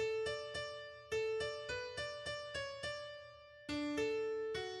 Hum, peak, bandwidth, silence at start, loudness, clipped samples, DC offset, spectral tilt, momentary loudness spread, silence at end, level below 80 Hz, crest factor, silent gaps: none; -28 dBFS; 11.5 kHz; 0 s; -42 LUFS; under 0.1%; under 0.1%; -3.5 dB/octave; 11 LU; 0 s; -66 dBFS; 14 dB; none